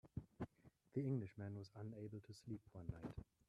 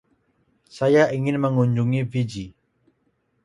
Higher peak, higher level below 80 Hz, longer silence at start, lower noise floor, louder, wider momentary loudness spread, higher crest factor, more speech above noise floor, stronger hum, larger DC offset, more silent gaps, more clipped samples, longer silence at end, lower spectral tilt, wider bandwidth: second, -32 dBFS vs -6 dBFS; second, -68 dBFS vs -58 dBFS; second, 0.05 s vs 0.75 s; about the same, -72 dBFS vs -69 dBFS; second, -51 LUFS vs -21 LUFS; about the same, 10 LU vs 12 LU; about the same, 18 dB vs 18 dB; second, 22 dB vs 48 dB; neither; neither; neither; neither; second, 0.25 s vs 0.95 s; about the same, -8.5 dB/octave vs -7.5 dB/octave; about the same, 11.5 kHz vs 11 kHz